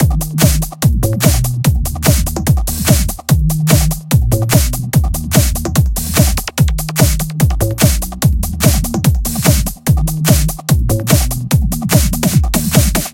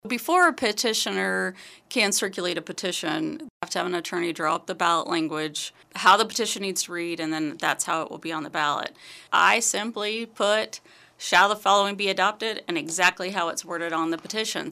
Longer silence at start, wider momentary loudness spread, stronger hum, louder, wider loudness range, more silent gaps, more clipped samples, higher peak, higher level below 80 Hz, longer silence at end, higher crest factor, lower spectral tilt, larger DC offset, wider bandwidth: about the same, 0 s vs 0.05 s; second, 3 LU vs 11 LU; neither; first, -13 LUFS vs -24 LUFS; second, 1 LU vs 4 LU; second, none vs 3.50-3.60 s; first, 0.2% vs under 0.1%; first, 0 dBFS vs -4 dBFS; first, -18 dBFS vs -74 dBFS; about the same, 0 s vs 0 s; second, 12 dB vs 20 dB; first, -5 dB/octave vs -2 dB/octave; neither; first, 17.5 kHz vs 15.5 kHz